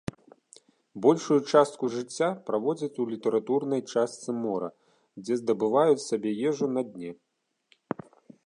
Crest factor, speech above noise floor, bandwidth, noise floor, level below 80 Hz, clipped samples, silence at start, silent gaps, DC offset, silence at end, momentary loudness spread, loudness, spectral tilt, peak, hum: 20 dB; 41 dB; 11 kHz; -68 dBFS; -70 dBFS; under 0.1%; 0.95 s; none; under 0.1%; 1.3 s; 16 LU; -27 LUFS; -5.5 dB/octave; -8 dBFS; none